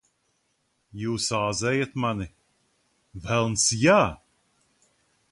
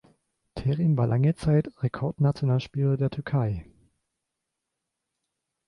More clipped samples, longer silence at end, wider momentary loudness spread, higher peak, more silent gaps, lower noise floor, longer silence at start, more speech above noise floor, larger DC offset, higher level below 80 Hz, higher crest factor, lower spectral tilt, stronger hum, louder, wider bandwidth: neither; second, 1.15 s vs 2.05 s; first, 21 LU vs 8 LU; first, -6 dBFS vs -12 dBFS; neither; second, -72 dBFS vs -84 dBFS; first, 0.95 s vs 0.55 s; second, 48 dB vs 59 dB; neither; about the same, -52 dBFS vs -52 dBFS; about the same, 20 dB vs 16 dB; second, -4 dB/octave vs -9 dB/octave; neither; about the same, -24 LUFS vs -26 LUFS; about the same, 11.5 kHz vs 10.5 kHz